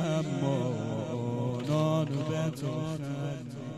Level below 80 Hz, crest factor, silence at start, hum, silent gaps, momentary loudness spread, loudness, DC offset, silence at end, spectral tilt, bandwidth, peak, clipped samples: -64 dBFS; 14 dB; 0 s; none; none; 7 LU; -32 LUFS; under 0.1%; 0 s; -7 dB/octave; 12.5 kHz; -16 dBFS; under 0.1%